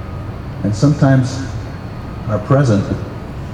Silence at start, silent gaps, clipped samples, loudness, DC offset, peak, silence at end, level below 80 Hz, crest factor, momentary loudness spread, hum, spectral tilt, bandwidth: 0 s; none; under 0.1%; -17 LUFS; under 0.1%; 0 dBFS; 0 s; -34 dBFS; 16 dB; 15 LU; none; -7.5 dB/octave; 9.6 kHz